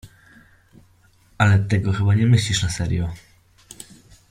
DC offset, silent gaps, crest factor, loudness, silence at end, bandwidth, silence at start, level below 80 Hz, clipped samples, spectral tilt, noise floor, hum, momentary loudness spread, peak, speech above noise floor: under 0.1%; none; 18 dB; -20 LUFS; 1.15 s; 12.5 kHz; 0.05 s; -44 dBFS; under 0.1%; -5.5 dB/octave; -56 dBFS; none; 23 LU; -4 dBFS; 37 dB